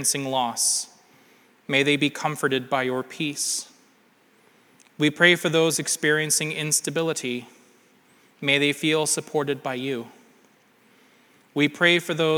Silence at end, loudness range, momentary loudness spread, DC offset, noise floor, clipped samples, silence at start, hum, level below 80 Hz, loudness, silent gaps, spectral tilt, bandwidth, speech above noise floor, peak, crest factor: 0 s; 4 LU; 11 LU; under 0.1%; -60 dBFS; under 0.1%; 0 s; none; -80 dBFS; -23 LUFS; none; -2.5 dB/octave; over 20 kHz; 36 dB; -4 dBFS; 22 dB